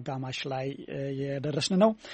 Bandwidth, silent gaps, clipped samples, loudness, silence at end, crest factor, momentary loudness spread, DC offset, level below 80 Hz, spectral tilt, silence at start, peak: 8.4 kHz; none; under 0.1%; -30 LUFS; 0 s; 20 dB; 11 LU; under 0.1%; -66 dBFS; -5.5 dB/octave; 0 s; -10 dBFS